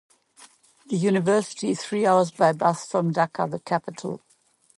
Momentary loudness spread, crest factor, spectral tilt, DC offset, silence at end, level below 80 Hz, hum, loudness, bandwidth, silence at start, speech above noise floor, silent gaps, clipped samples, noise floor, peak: 12 LU; 18 dB; -6 dB/octave; under 0.1%; 0.6 s; -72 dBFS; none; -24 LUFS; 11.5 kHz; 0.4 s; 39 dB; none; under 0.1%; -62 dBFS; -6 dBFS